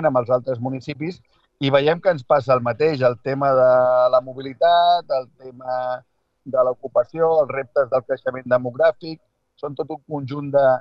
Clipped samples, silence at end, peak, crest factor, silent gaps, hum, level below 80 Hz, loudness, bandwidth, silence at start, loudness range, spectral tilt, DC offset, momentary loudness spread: under 0.1%; 0 s; -2 dBFS; 16 dB; none; none; -64 dBFS; -20 LUFS; 6.2 kHz; 0 s; 5 LU; -7.5 dB/octave; under 0.1%; 14 LU